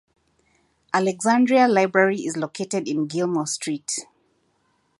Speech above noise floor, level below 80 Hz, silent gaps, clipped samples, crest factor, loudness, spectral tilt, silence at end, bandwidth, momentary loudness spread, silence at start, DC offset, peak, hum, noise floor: 46 dB; -74 dBFS; none; under 0.1%; 20 dB; -22 LUFS; -4.5 dB/octave; 0.95 s; 11.5 kHz; 11 LU; 0.95 s; under 0.1%; -4 dBFS; none; -67 dBFS